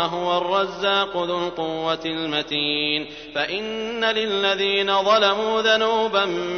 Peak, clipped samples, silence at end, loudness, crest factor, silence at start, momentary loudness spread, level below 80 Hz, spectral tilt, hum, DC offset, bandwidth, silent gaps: -4 dBFS; under 0.1%; 0 s; -21 LUFS; 18 dB; 0 s; 8 LU; -56 dBFS; -3.5 dB/octave; none; under 0.1%; 6.6 kHz; none